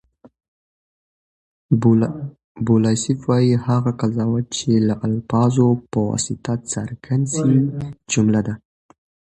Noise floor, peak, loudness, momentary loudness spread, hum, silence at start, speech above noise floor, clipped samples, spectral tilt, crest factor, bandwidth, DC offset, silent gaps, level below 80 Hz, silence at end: under -90 dBFS; -2 dBFS; -19 LUFS; 10 LU; none; 0.25 s; over 72 dB; under 0.1%; -6.5 dB/octave; 18 dB; 9.8 kHz; under 0.1%; 0.48-1.69 s, 2.44-2.55 s; -52 dBFS; 0.8 s